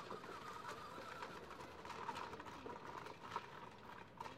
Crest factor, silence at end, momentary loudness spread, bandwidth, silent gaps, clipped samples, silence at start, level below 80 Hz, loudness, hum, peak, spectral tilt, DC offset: 20 dB; 0 s; 7 LU; 16 kHz; none; under 0.1%; 0 s; -74 dBFS; -52 LUFS; none; -32 dBFS; -4 dB/octave; under 0.1%